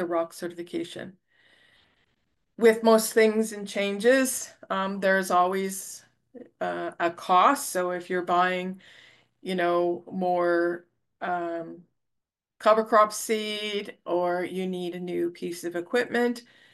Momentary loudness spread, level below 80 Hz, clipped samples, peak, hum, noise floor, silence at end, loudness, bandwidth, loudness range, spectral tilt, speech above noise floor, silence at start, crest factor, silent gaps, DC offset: 15 LU; -78 dBFS; under 0.1%; -8 dBFS; none; -84 dBFS; 0.35 s; -26 LUFS; 12.5 kHz; 5 LU; -4 dB/octave; 58 dB; 0 s; 18 dB; none; under 0.1%